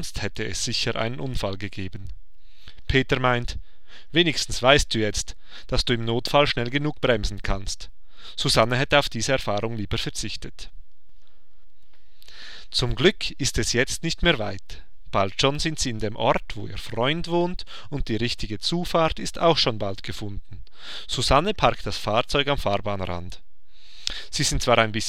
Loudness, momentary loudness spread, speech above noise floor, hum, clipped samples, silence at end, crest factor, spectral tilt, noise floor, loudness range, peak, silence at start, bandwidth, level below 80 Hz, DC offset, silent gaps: -24 LUFS; 16 LU; 34 dB; none; under 0.1%; 0 s; 24 dB; -4 dB/octave; -58 dBFS; 5 LU; 0 dBFS; 0 s; 16 kHz; -36 dBFS; 3%; none